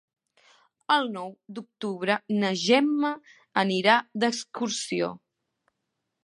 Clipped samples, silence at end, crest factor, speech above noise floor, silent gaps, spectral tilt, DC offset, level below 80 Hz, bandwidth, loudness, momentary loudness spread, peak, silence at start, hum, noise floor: under 0.1%; 1.1 s; 22 dB; 55 dB; none; -4 dB/octave; under 0.1%; -78 dBFS; 11.5 kHz; -26 LUFS; 16 LU; -6 dBFS; 0.9 s; none; -81 dBFS